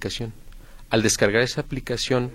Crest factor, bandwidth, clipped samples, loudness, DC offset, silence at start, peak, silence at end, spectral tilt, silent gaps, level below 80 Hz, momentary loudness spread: 22 dB; 16.5 kHz; under 0.1%; -23 LUFS; under 0.1%; 0 s; -2 dBFS; 0 s; -4 dB/octave; none; -42 dBFS; 12 LU